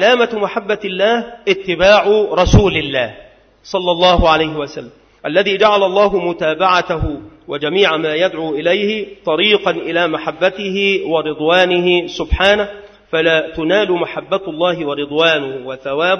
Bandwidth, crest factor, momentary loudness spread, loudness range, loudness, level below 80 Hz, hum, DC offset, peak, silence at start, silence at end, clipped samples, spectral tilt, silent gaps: 6.6 kHz; 14 dB; 9 LU; 2 LU; -15 LUFS; -30 dBFS; none; under 0.1%; 0 dBFS; 0 s; 0 s; under 0.1%; -5.5 dB/octave; none